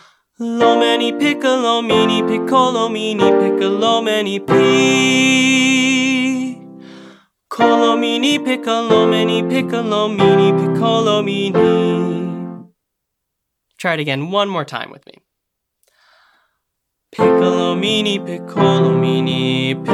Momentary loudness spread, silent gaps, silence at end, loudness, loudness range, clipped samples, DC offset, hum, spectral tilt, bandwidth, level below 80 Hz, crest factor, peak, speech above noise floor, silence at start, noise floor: 11 LU; none; 0 s; -15 LUFS; 10 LU; under 0.1%; under 0.1%; none; -5 dB/octave; 12.5 kHz; -62 dBFS; 16 dB; 0 dBFS; 62 dB; 0.4 s; -76 dBFS